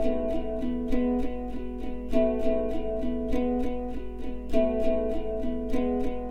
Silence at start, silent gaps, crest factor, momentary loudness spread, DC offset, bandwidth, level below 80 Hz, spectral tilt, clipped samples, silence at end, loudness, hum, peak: 0 s; none; 16 dB; 10 LU; under 0.1%; 6.4 kHz; -36 dBFS; -8 dB/octave; under 0.1%; 0 s; -30 LUFS; none; -10 dBFS